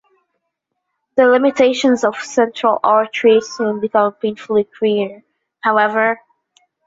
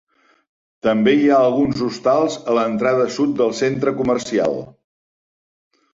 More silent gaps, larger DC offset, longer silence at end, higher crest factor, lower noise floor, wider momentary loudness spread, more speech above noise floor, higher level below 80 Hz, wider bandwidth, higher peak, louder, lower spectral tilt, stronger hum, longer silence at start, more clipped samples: neither; neither; second, 0.7 s vs 1.25 s; about the same, 16 dB vs 16 dB; second, -75 dBFS vs under -90 dBFS; about the same, 8 LU vs 6 LU; second, 60 dB vs over 73 dB; second, -64 dBFS vs -56 dBFS; about the same, 8 kHz vs 7.8 kHz; about the same, -2 dBFS vs -2 dBFS; about the same, -16 LUFS vs -18 LUFS; second, -4.5 dB/octave vs -6 dB/octave; neither; first, 1.15 s vs 0.85 s; neither